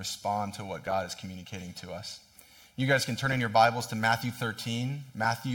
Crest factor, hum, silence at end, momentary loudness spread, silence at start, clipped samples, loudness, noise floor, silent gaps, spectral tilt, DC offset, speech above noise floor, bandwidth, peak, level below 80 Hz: 22 dB; none; 0 s; 16 LU; 0 s; under 0.1%; -30 LUFS; -56 dBFS; none; -4.5 dB/octave; under 0.1%; 26 dB; 17.5 kHz; -8 dBFS; -66 dBFS